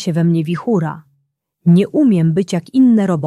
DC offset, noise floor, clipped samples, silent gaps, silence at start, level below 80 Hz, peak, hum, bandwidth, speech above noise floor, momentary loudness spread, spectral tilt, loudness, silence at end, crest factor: under 0.1%; -66 dBFS; under 0.1%; none; 0 s; -58 dBFS; -4 dBFS; none; 10.5 kHz; 53 dB; 7 LU; -8 dB/octave; -15 LUFS; 0 s; 12 dB